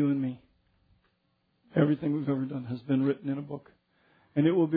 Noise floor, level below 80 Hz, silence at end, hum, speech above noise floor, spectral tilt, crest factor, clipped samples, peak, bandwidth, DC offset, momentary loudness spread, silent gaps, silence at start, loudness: -74 dBFS; -70 dBFS; 0 s; none; 46 dB; -12 dB/octave; 20 dB; under 0.1%; -10 dBFS; 4.8 kHz; under 0.1%; 11 LU; none; 0 s; -29 LUFS